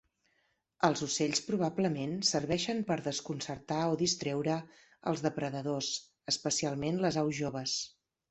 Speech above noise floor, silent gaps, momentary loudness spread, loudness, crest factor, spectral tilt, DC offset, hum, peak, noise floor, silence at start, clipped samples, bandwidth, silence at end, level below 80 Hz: 43 dB; none; 6 LU; -33 LUFS; 22 dB; -4 dB/octave; under 0.1%; none; -12 dBFS; -76 dBFS; 0.8 s; under 0.1%; 8.4 kHz; 0.4 s; -66 dBFS